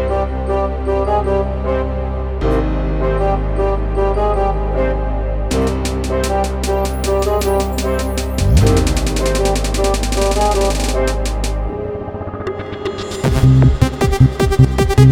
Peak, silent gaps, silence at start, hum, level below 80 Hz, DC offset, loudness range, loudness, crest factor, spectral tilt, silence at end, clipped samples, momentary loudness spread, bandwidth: 0 dBFS; none; 0 s; none; -20 dBFS; under 0.1%; 3 LU; -17 LUFS; 14 dB; -6 dB/octave; 0 s; under 0.1%; 9 LU; 19.5 kHz